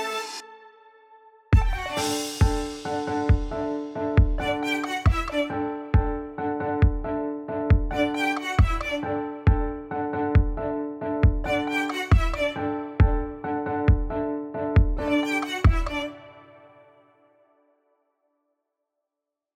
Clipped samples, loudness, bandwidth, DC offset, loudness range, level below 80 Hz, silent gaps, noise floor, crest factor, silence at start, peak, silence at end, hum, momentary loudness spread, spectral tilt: under 0.1%; -25 LUFS; 15 kHz; under 0.1%; 3 LU; -28 dBFS; none; -86 dBFS; 18 dB; 0 s; -6 dBFS; 3.15 s; none; 7 LU; -6.5 dB/octave